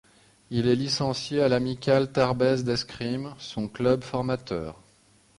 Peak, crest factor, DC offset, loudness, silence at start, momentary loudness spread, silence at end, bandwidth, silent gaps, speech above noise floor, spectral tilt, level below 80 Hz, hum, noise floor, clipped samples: -8 dBFS; 18 dB; under 0.1%; -26 LUFS; 0.5 s; 11 LU; 0.65 s; 11.5 kHz; none; 35 dB; -6 dB/octave; -54 dBFS; none; -60 dBFS; under 0.1%